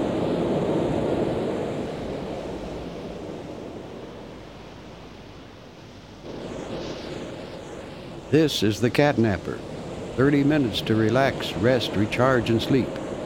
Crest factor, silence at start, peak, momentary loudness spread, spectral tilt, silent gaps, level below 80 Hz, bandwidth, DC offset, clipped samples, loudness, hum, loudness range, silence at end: 22 dB; 0 s; -4 dBFS; 21 LU; -6 dB/octave; none; -48 dBFS; 16 kHz; under 0.1%; under 0.1%; -24 LUFS; none; 16 LU; 0 s